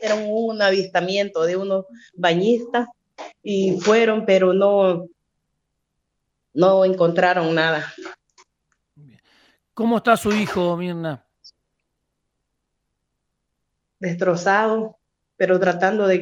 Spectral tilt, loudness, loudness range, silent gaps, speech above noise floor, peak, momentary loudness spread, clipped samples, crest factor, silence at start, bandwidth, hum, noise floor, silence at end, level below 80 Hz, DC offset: -5.5 dB/octave; -19 LUFS; 8 LU; none; 57 dB; -2 dBFS; 14 LU; under 0.1%; 18 dB; 0 s; 16 kHz; none; -76 dBFS; 0 s; -62 dBFS; under 0.1%